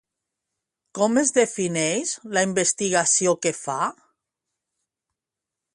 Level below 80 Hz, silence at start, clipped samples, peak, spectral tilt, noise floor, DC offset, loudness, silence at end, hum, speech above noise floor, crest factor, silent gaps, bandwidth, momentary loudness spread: -70 dBFS; 0.95 s; under 0.1%; -6 dBFS; -3 dB/octave; -87 dBFS; under 0.1%; -22 LUFS; 1.8 s; none; 65 dB; 20 dB; none; 11.5 kHz; 8 LU